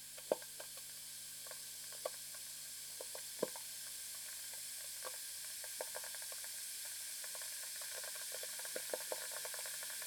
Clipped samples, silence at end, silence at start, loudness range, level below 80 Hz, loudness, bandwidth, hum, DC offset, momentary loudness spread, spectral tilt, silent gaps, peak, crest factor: under 0.1%; 0 s; 0 s; 3 LU; -84 dBFS; -44 LUFS; over 20 kHz; none; under 0.1%; 4 LU; 0.5 dB/octave; none; -18 dBFS; 28 dB